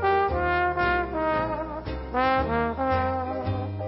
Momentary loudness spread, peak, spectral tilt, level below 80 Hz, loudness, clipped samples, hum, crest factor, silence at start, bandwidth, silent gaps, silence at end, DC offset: 7 LU; -10 dBFS; -11 dB/octave; -40 dBFS; -26 LUFS; under 0.1%; none; 14 dB; 0 s; 5.8 kHz; none; 0 s; under 0.1%